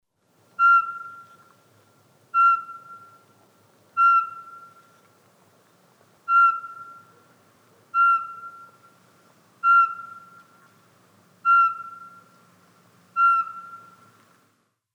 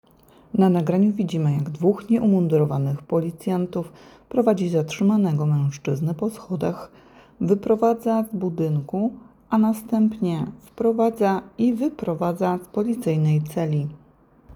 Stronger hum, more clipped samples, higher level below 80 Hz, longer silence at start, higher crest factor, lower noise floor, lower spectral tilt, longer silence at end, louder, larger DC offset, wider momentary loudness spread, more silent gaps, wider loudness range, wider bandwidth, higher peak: neither; neither; second, under -90 dBFS vs -58 dBFS; about the same, 0.6 s vs 0.55 s; about the same, 16 dB vs 16 dB; first, -68 dBFS vs -54 dBFS; second, -2 dB/octave vs -8.5 dB/octave; first, 1.2 s vs 0.05 s; about the same, -20 LUFS vs -22 LUFS; neither; first, 25 LU vs 8 LU; neither; about the same, 3 LU vs 3 LU; second, 10 kHz vs 20 kHz; second, -10 dBFS vs -6 dBFS